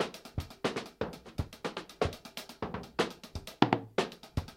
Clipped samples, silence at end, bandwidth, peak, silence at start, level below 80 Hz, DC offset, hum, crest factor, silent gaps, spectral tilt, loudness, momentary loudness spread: under 0.1%; 0 s; 16 kHz; -6 dBFS; 0 s; -52 dBFS; under 0.1%; none; 30 dB; none; -5.5 dB/octave; -36 LUFS; 13 LU